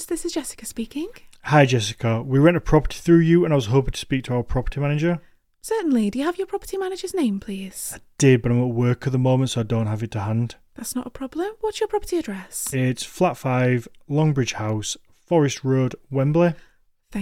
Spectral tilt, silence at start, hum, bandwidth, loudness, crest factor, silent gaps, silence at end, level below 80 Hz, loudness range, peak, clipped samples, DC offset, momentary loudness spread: -6 dB/octave; 0 s; none; 16 kHz; -22 LUFS; 18 dB; none; 0 s; -40 dBFS; 6 LU; -2 dBFS; under 0.1%; under 0.1%; 13 LU